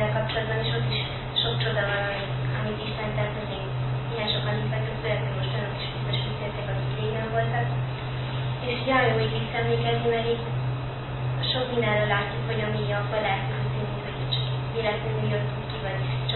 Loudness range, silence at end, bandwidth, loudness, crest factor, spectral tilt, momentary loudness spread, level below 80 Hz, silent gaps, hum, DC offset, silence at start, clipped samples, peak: 2 LU; 0 s; 4.3 kHz; -27 LUFS; 18 dB; -10.5 dB/octave; 6 LU; -44 dBFS; none; none; under 0.1%; 0 s; under 0.1%; -10 dBFS